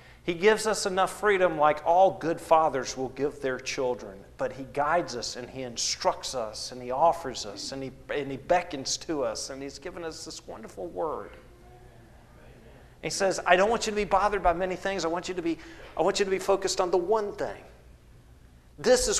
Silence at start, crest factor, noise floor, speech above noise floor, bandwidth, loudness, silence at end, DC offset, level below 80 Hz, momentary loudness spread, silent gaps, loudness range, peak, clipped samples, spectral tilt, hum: 0.05 s; 24 dB; -53 dBFS; 26 dB; 13 kHz; -27 LUFS; 0 s; under 0.1%; -52 dBFS; 15 LU; none; 9 LU; -4 dBFS; under 0.1%; -3 dB/octave; none